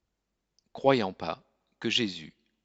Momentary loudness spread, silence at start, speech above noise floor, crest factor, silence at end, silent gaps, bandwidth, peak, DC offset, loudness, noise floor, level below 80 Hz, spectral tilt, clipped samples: 15 LU; 0.75 s; 54 dB; 24 dB; 0.35 s; none; 8 kHz; -8 dBFS; under 0.1%; -29 LUFS; -82 dBFS; -70 dBFS; -4.5 dB/octave; under 0.1%